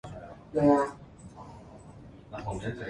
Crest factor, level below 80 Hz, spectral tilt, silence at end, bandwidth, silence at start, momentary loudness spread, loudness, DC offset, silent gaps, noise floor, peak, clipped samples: 20 dB; -54 dBFS; -7.5 dB/octave; 0 s; 11 kHz; 0.05 s; 25 LU; -28 LUFS; under 0.1%; none; -49 dBFS; -12 dBFS; under 0.1%